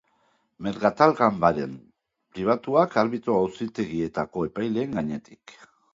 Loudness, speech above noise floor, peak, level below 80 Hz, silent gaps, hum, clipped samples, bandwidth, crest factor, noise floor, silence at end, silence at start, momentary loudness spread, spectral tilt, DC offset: -24 LUFS; 43 dB; -2 dBFS; -58 dBFS; none; none; under 0.1%; 7.8 kHz; 24 dB; -68 dBFS; 0.6 s; 0.6 s; 14 LU; -7.5 dB/octave; under 0.1%